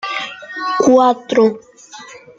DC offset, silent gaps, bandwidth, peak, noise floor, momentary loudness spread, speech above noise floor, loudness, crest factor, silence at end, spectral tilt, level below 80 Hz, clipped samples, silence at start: under 0.1%; none; 7.8 kHz; -2 dBFS; -37 dBFS; 24 LU; 24 dB; -14 LUFS; 14 dB; 0.2 s; -4 dB/octave; -64 dBFS; under 0.1%; 0.05 s